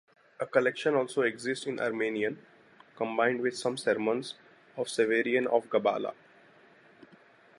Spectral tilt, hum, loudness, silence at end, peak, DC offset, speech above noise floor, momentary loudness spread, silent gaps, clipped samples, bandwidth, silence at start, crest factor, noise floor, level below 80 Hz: -4.5 dB/octave; none; -30 LUFS; 1.45 s; -10 dBFS; under 0.1%; 29 dB; 11 LU; none; under 0.1%; 11.5 kHz; 0.4 s; 22 dB; -59 dBFS; -82 dBFS